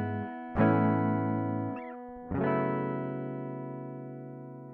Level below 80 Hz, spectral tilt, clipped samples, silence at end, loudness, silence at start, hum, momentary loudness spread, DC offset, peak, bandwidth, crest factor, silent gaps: -56 dBFS; -11.5 dB/octave; under 0.1%; 0 s; -31 LUFS; 0 s; none; 16 LU; under 0.1%; -14 dBFS; 4.4 kHz; 18 dB; none